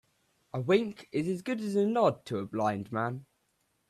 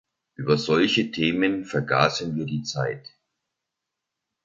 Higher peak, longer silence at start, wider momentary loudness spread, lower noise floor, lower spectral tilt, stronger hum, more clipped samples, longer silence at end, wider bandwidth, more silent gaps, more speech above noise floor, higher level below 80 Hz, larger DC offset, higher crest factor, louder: second, -12 dBFS vs -4 dBFS; first, 0.55 s vs 0.4 s; about the same, 10 LU vs 9 LU; second, -75 dBFS vs -84 dBFS; first, -7 dB/octave vs -5 dB/octave; neither; neither; second, 0.65 s vs 1.45 s; first, 13 kHz vs 7.8 kHz; neither; second, 45 dB vs 61 dB; second, -72 dBFS vs -60 dBFS; neither; about the same, 18 dB vs 22 dB; second, -31 LUFS vs -24 LUFS